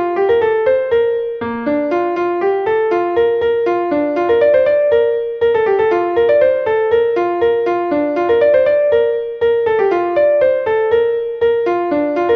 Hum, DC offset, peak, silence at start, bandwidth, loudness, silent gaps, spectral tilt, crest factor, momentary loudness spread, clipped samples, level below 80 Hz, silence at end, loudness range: none; under 0.1%; -2 dBFS; 0 s; 5.6 kHz; -15 LUFS; none; -7 dB/octave; 12 dB; 5 LU; under 0.1%; -50 dBFS; 0 s; 2 LU